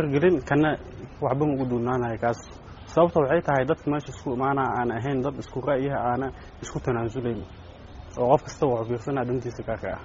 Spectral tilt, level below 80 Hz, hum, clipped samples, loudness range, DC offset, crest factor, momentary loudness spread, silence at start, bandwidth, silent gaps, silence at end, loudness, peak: -6.5 dB/octave; -48 dBFS; none; under 0.1%; 3 LU; under 0.1%; 20 dB; 14 LU; 0 s; 7.4 kHz; none; 0 s; -26 LUFS; -4 dBFS